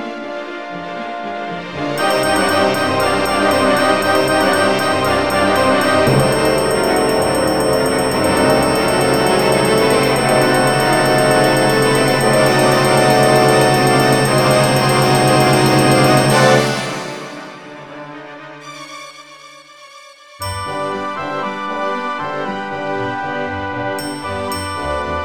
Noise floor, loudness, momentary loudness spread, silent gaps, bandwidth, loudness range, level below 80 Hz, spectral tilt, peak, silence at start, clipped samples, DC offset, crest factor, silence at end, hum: -40 dBFS; -14 LUFS; 15 LU; none; 19 kHz; 13 LU; -42 dBFS; -4.5 dB/octave; 0 dBFS; 0 s; under 0.1%; 0.7%; 14 dB; 0 s; none